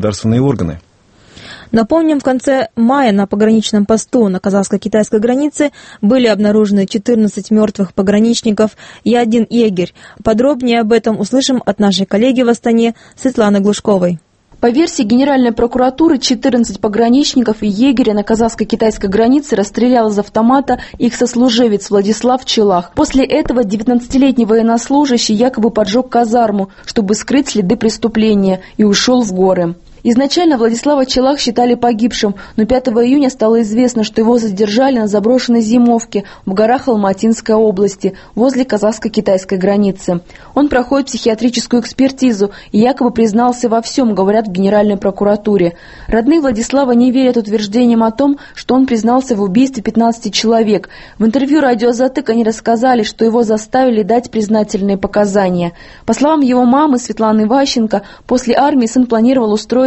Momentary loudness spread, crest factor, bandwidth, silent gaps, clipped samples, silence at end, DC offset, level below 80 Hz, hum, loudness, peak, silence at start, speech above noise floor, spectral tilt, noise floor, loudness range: 5 LU; 12 dB; 8.8 kHz; none; under 0.1%; 0 s; under 0.1%; -40 dBFS; none; -12 LUFS; 0 dBFS; 0 s; 33 dB; -5.5 dB/octave; -45 dBFS; 1 LU